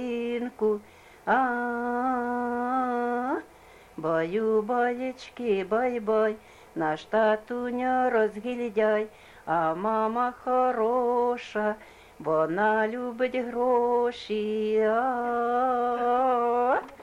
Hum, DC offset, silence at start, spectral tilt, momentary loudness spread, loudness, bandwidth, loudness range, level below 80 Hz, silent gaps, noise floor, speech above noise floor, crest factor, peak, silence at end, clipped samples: none; under 0.1%; 0 s; -6.5 dB/octave; 7 LU; -27 LUFS; 12 kHz; 2 LU; -64 dBFS; none; -52 dBFS; 26 dB; 14 dB; -12 dBFS; 0 s; under 0.1%